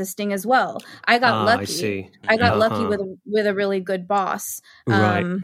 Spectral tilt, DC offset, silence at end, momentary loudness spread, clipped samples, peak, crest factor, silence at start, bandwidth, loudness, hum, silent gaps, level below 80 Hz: -4.5 dB/octave; under 0.1%; 0 s; 10 LU; under 0.1%; -2 dBFS; 20 dB; 0 s; 16.5 kHz; -21 LUFS; none; none; -62 dBFS